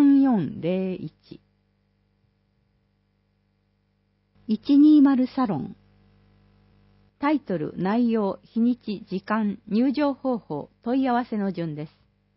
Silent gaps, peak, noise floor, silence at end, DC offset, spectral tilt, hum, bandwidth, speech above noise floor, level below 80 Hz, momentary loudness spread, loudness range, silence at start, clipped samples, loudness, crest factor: none; -10 dBFS; -69 dBFS; 0.5 s; under 0.1%; -11.5 dB/octave; 50 Hz at -55 dBFS; 5.8 kHz; 45 dB; -64 dBFS; 15 LU; 8 LU; 0 s; under 0.1%; -23 LUFS; 14 dB